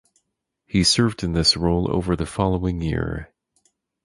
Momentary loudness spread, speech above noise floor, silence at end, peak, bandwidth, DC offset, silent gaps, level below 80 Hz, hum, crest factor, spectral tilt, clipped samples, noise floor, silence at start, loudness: 8 LU; 55 dB; 0.8 s; -4 dBFS; 11.5 kHz; under 0.1%; none; -36 dBFS; none; 18 dB; -4.5 dB/octave; under 0.1%; -76 dBFS; 0.75 s; -21 LUFS